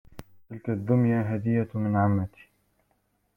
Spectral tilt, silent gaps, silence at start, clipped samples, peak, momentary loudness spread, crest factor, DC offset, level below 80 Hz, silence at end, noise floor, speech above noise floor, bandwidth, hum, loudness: -11 dB/octave; none; 0.15 s; under 0.1%; -10 dBFS; 14 LU; 16 dB; under 0.1%; -60 dBFS; 1.1 s; -71 dBFS; 46 dB; 3.4 kHz; 50 Hz at -45 dBFS; -26 LUFS